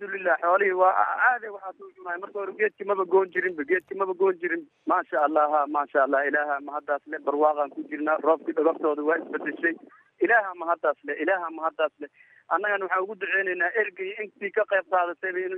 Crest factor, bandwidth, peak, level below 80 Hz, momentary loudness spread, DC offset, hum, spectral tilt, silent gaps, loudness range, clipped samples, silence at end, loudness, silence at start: 18 dB; 3.9 kHz; -8 dBFS; -88 dBFS; 10 LU; under 0.1%; none; -7 dB/octave; none; 2 LU; under 0.1%; 0 s; -25 LUFS; 0 s